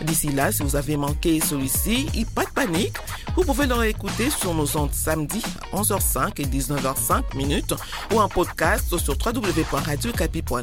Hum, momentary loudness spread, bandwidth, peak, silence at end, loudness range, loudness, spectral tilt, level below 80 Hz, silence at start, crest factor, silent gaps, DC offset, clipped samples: none; 5 LU; 17 kHz; -6 dBFS; 0 s; 1 LU; -23 LUFS; -4 dB/octave; -30 dBFS; 0 s; 18 dB; none; under 0.1%; under 0.1%